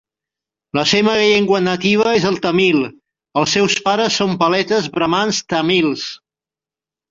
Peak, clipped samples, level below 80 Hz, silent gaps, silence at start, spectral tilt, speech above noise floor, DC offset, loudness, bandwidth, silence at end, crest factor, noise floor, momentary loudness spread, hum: -2 dBFS; under 0.1%; -54 dBFS; none; 0.75 s; -4 dB/octave; 74 dB; under 0.1%; -15 LUFS; 7.6 kHz; 0.95 s; 14 dB; -89 dBFS; 6 LU; none